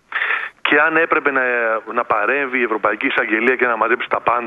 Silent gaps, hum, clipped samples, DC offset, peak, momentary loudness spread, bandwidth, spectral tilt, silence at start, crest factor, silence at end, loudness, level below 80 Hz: none; none; under 0.1%; under 0.1%; 0 dBFS; 5 LU; 6.6 kHz; -6 dB/octave; 0.1 s; 18 dB; 0 s; -17 LUFS; -62 dBFS